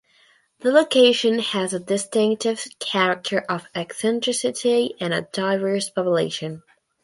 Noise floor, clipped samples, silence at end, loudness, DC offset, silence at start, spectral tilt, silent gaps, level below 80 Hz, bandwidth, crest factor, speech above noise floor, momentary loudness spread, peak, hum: -59 dBFS; under 0.1%; 0.45 s; -21 LUFS; under 0.1%; 0.65 s; -3.5 dB/octave; none; -70 dBFS; 11.5 kHz; 18 dB; 37 dB; 11 LU; -4 dBFS; none